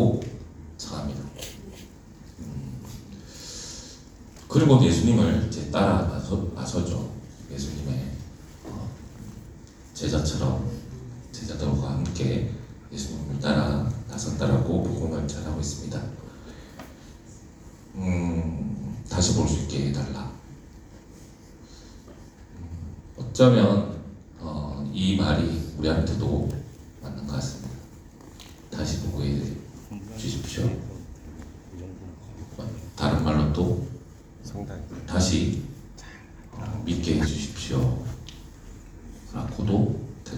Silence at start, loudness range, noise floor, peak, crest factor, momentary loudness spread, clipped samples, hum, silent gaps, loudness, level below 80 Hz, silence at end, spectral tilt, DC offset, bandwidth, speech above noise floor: 0 s; 10 LU; -47 dBFS; -4 dBFS; 24 dB; 23 LU; under 0.1%; none; none; -26 LUFS; -40 dBFS; 0 s; -6 dB/octave; under 0.1%; 19.5 kHz; 24 dB